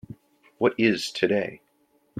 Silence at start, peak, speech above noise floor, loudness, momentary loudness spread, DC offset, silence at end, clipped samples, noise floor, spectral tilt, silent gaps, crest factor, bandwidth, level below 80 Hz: 0.1 s; -8 dBFS; 42 dB; -24 LUFS; 5 LU; under 0.1%; 0 s; under 0.1%; -66 dBFS; -5 dB/octave; none; 20 dB; 14.5 kHz; -66 dBFS